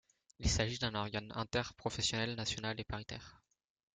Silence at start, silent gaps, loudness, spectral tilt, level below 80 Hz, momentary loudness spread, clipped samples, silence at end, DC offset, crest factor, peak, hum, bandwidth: 0.4 s; none; -38 LUFS; -3.5 dB/octave; -50 dBFS; 10 LU; under 0.1%; 0.6 s; under 0.1%; 22 dB; -18 dBFS; none; 9.6 kHz